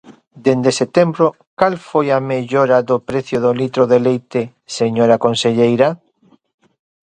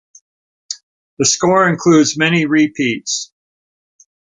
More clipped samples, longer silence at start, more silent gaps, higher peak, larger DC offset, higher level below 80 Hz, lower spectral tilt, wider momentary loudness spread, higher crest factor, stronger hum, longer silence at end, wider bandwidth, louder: neither; second, 0.1 s vs 0.7 s; second, 1.47-1.57 s vs 0.83-1.17 s; about the same, 0 dBFS vs -2 dBFS; neither; about the same, -56 dBFS vs -58 dBFS; first, -6 dB/octave vs -4 dB/octave; second, 7 LU vs 17 LU; about the same, 16 dB vs 16 dB; neither; about the same, 1.15 s vs 1.15 s; about the same, 9.8 kHz vs 9.6 kHz; about the same, -15 LUFS vs -14 LUFS